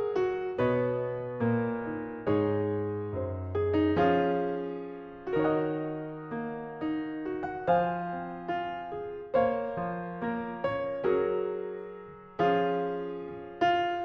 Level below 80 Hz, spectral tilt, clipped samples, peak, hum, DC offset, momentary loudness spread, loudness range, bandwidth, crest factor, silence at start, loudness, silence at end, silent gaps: -60 dBFS; -8.5 dB/octave; under 0.1%; -14 dBFS; none; under 0.1%; 11 LU; 3 LU; 6.2 kHz; 16 dB; 0 s; -31 LUFS; 0 s; none